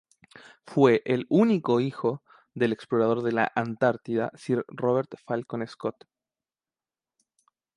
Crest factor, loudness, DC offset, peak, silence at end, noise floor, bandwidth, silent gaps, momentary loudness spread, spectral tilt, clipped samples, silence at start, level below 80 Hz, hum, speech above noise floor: 20 dB; -26 LUFS; under 0.1%; -8 dBFS; 1.85 s; under -90 dBFS; 10.5 kHz; none; 11 LU; -7.5 dB/octave; under 0.1%; 0.65 s; -72 dBFS; none; over 64 dB